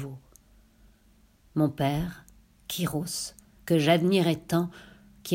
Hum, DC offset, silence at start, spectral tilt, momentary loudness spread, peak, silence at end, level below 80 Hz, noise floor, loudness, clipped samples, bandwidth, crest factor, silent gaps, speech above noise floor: none; under 0.1%; 0 s; -5.5 dB/octave; 22 LU; -8 dBFS; 0 s; -54 dBFS; -61 dBFS; -27 LUFS; under 0.1%; 16.5 kHz; 20 dB; none; 35 dB